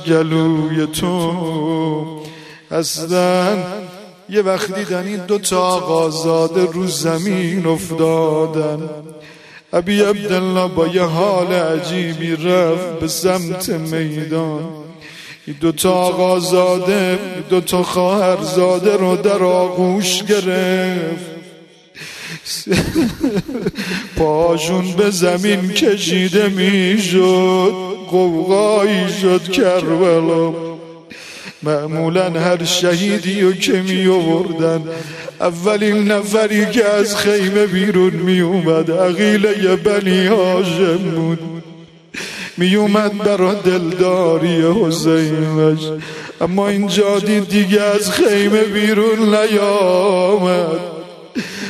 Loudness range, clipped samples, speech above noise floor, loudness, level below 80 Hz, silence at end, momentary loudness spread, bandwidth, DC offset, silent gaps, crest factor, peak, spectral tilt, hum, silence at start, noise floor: 5 LU; under 0.1%; 27 dB; -15 LUFS; -48 dBFS; 0 s; 11 LU; 13.5 kHz; under 0.1%; none; 14 dB; 0 dBFS; -5 dB/octave; none; 0 s; -42 dBFS